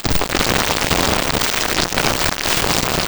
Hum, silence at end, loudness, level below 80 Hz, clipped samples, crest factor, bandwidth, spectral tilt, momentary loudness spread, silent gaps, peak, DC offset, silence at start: none; 0 s; -15 LUFS; -30 dBFS; under 0.1%; 16 dB; over 20 kHz; -2.5 dB/octave; 2 LU; none; 0 dBFS; under 0.1%; 0 s